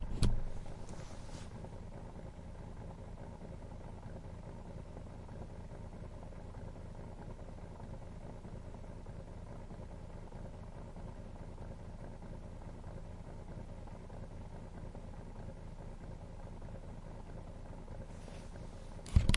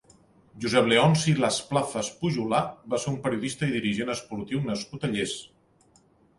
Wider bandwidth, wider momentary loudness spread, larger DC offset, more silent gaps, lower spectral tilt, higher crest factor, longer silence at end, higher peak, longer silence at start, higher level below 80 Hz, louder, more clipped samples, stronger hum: about the same, 11.5 kHz vs 11.5 kHz; second, 1 LU vs 11 LU; neither; neither; about the same, -6 dB/octave vs -5 dB/octave; first, 28 dB vs 20 dB; second, 0 s vs 0.95 s; second, -14 dBFS vs -6 dBFS; second, 0 s vs 0.55 s; first, -46 dBFS vs -58 dBFS; second, -48 LUFS vs -26 LUFS; neither; neither